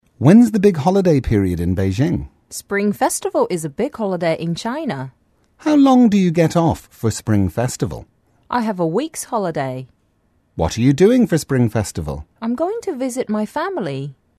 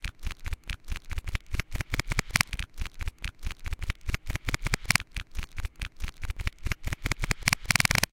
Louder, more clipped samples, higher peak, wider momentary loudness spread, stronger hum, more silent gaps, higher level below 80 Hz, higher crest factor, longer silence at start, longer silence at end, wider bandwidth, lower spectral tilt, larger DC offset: first, -18 LUFS vs -31 LUFS; neither; about the same, 0 dBFS vs -2 dBFS; about the same, 13 LU vs 13 LU; neither; neither; about the same, -40 dBFS vs -36 dBFS; second, 18 dB vs 30 dB; first, 0.2 s vs 0 s; first, 0.25 s vs 0.05 s; second, 13.5 kHz vs 17 kHz; first, -6.5 dB/octave vs -2.5 dB/octave; neither